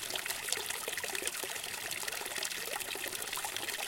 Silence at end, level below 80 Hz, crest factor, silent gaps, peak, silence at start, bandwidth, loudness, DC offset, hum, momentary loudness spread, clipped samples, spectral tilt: 0 s; -70 dBFS; 28 dB; none; -10 dBFS; 0 s; 17 kHz; -36 LUFS; under 0.1%; none; 2 LU; under 0.1%; 0.5 dB/octave